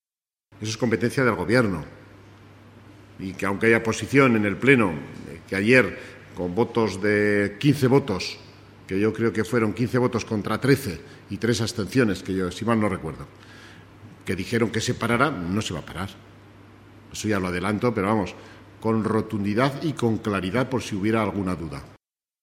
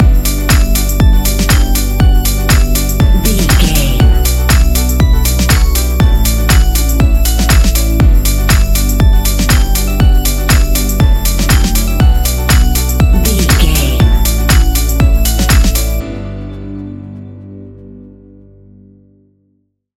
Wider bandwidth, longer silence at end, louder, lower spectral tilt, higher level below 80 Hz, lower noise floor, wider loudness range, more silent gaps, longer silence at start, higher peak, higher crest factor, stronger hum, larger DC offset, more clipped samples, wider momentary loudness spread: about the same, 16 kHz vs 17 kHz; second, 0.5 s vs 2 s; second, -23 LUFS vs -11 LUFS; first, -6 dB/octave vs -4.5 dB/octave; second, -54 dBFS vs -10 dBFS; first, under -90 dBFS vs -60 dBFS; about the same, 6 LU vs 5 LU; neither; first, 0.55 s vs 0 s; about the same, -2 dBFS vs 0 dBFS; first, 22 dB vs 10 dB; second, none vs 50 Hz at -25 dBFS; neither; neither; first, 16 LU vs 6 LU